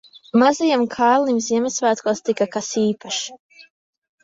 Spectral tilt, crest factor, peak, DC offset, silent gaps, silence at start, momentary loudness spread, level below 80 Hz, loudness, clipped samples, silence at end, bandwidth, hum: -3.5 dB/octave; 18 dB; -2 dBFS; under 0.1%; 3.39-3.50 s; 0.35 s; 8 LU; -66 dBFS; -19 LUFS; under 0.1%; 0.6 s; 7.8 kHz; none